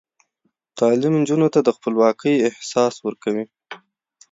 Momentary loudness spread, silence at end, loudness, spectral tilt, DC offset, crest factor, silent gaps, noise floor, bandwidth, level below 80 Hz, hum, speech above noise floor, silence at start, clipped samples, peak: 21 LU; 0.55 s; -19 LUFS; -6 dB/octave; under 0.1%; 16 dB; none; -71 dBFS; 7.8 kHz; -70 dBFS; none; 53 dB; 0.75 s; under 0.1%; -4 dBFS